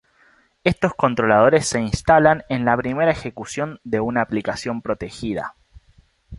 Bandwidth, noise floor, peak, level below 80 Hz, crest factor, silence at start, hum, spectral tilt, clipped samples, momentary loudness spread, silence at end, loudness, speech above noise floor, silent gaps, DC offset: 11.5 kHz; -57 dBFS; -2 dBFS; -44 dBFS; 18 dB; 0.65 s; none; -5.5 dB/octave; under 0.1%; 12 LU; 0 s; -20 LUFS; 38 dB; none; under 0.1%